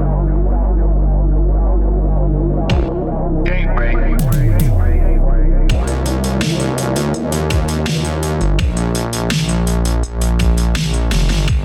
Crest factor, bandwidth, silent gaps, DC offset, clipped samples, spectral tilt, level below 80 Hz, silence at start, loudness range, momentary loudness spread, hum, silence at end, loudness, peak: 12 dB; 17 kHz; none; under 0.1%; under 0.1%; -6 dB/octave; -14 dBFS; 0 s; 1 LU; 3 LU; none; 0 s; -17 LUFS; -2 dBFS